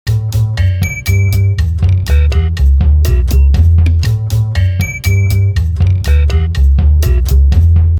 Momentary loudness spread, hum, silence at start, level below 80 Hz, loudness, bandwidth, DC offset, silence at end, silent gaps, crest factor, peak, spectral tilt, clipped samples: 4 LU; none; 0.05 s; -14 dBFS; -12 LUFS; 18 kHz; under 0.1%; 0 s; none; 10 dB; 0 dBFS; -6.5 dB/octave; under 0.1%